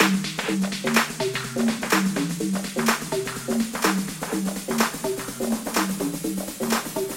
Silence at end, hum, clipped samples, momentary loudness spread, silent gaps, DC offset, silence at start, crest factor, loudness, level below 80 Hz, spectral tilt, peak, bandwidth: 0 s; none; under 0.1%; 6 LU; none; under 0.1%; 0 s; 22 dB; -25 LUFS; -54 dBFS; -4 dB/octave; -4 dBFS; 16.5 kHz